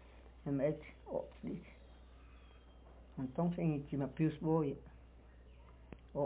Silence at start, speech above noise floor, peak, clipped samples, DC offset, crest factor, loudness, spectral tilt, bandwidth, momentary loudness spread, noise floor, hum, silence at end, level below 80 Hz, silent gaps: 0 s; 21 dB; -22 dBFS; under 0.1%; under 0.1%; 20 dB; -39 LUFS; -9 dB/octave; 4 kHz; 25 LU; -59 dBFS; none; 0 s; -60 dBFS; none